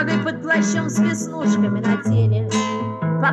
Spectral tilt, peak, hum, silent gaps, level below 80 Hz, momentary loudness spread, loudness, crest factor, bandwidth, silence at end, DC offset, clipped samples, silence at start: -6 dB/octave; -8 dBFS; none; none; -60 dBFS; 4 LU; -20 LUFS; 12 dB; 12 kHz; 0 s; under 0.1%; under 0.1%; 0 s